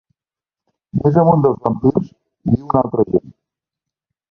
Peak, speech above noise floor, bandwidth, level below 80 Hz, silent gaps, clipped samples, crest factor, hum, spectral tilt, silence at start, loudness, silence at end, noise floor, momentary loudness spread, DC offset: 0 dBFS; 75 dB; 5.8 kHz; -46 dBFS; none; under 0.1%; 18 dB; none; -12.5 dB/octave; 0.95 s; -17 LUFS; 1 s; -90 dBFS; 11 LU; under 0.1%